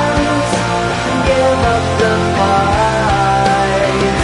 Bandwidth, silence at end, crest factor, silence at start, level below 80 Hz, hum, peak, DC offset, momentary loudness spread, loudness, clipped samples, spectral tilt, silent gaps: 11 kHz; 0 s; 12 dB; 0 s; -28 dBFS; none; -2 dBFS; under 0.1%; 3 LU; -13 LUFS; under 0.1%; -5 dB/octave; none